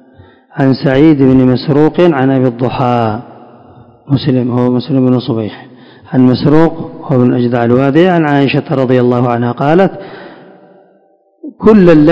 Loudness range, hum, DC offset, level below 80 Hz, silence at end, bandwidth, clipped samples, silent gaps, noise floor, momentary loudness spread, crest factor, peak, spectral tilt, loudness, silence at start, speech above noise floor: 4 LU; none; under 0.1%; -40 dBFS; 0 s; 6.2 kHz; 2%; none; -50 dBFS; 10 LU; 10 dB; 0 dBFS; -9.5 dB/octave; -10 LUFS; 0.55 s; 41 dB